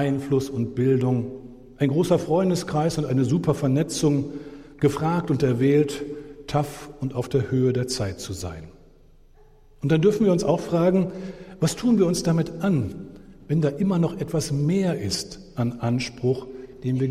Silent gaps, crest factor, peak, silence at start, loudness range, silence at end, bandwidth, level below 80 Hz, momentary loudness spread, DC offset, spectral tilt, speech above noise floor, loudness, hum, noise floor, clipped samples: none; 16 dB; -6 dBFS; 0 s; 3 LU; 0 s; 15 kHz; -50 dBFS; 13 LU; under 0.1%; -6.5 dB/octave; 29 dB; -23 LUFS; none; -52 dBFS; under 0.1%